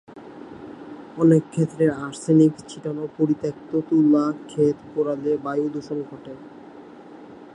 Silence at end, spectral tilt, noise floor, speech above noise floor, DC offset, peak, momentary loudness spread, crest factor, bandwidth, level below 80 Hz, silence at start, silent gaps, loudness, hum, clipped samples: 0.1 s; -8 dB/octave; -43 dBFS; 21 dB; under 0.1%; -6 dBFS; 25 LU; 18 dB; 10.5 kHz; -64 dBFS; 0.1 s; none; -22 LUFS; none; under 0.1%